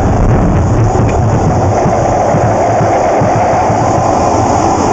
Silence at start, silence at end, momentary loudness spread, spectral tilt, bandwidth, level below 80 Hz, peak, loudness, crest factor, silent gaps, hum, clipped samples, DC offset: 0 s; 0 s; 1 LU; -7 dB/octave; 8.4 kHz; -20 dBFS; 0 dBFS; -10 LUFS; 10 dB; none; none; under 0.1%; under 0.1%